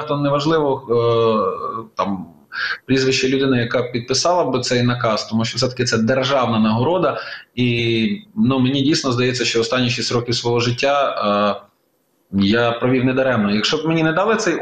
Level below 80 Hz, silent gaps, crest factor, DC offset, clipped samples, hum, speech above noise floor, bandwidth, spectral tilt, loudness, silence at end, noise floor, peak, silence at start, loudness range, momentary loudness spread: -52 dBFS; none; 14 dB; 0.1%; under 0.1%; none; 46 dB; 9.4 kHz; -5 dB/octave; -18 LUFS; 0 s; -64 dBFS; -4 dBFS; 0 s; 1 LU; 7 LU